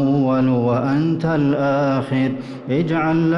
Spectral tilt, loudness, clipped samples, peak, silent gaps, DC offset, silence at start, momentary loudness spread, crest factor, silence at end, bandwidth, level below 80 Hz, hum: -9 dB/octave; -18 LUFS; under 0.1%; -8 dBFS; none; under 0.1%; 0 s; 5 LU; 8 dB; 0 s; 6.4 kHz; -52 dBFS; none